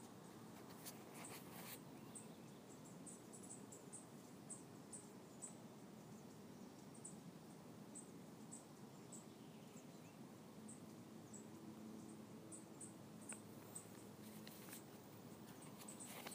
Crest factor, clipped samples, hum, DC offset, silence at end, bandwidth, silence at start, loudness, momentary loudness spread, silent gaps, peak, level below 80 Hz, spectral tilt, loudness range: 22 dB; under 0.1%; none; under 0.1%; 0 s; 15.5 kHz; 0 s; -57 LUFS; 5 LU; none; -36 dBFS; -88 dBFS; -4 dB/octave; 2 LU